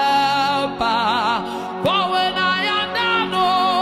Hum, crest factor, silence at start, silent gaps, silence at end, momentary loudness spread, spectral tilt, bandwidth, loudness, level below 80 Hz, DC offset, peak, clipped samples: none; 10 dB; 0 s; none; 0 s; 4 LU; -4 dB/octave; 15.5 kHz; -18 LUFS; -54 dBFS; under 0.1%; -8 dBFS; under 0.1%